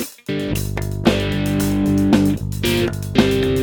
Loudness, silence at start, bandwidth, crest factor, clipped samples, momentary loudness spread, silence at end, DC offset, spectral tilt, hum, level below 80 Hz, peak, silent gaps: -19 LUFS; 0 s; over 20 kHz; 18 dB; under 0.1%; 7 LU; 0 s; under 0.1%; -6 dB/octave; 50 Hz at -35 dBFS; -32 dBFS; 0 dBFS; none